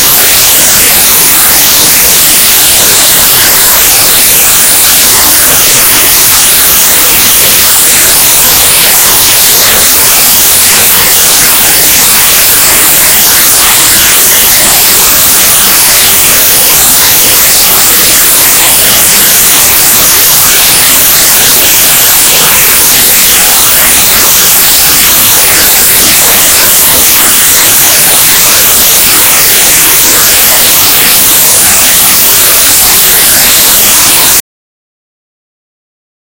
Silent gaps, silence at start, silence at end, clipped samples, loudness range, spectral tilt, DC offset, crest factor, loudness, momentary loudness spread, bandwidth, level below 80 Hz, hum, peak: none; 0 s; 2 s; 20%; 0 LU; 0.5 dB/octave; under 0.1%; 4 dB; 0 LUFS; 0 LU; over 20 kHz; -30 dBFS; none; 0 dBFS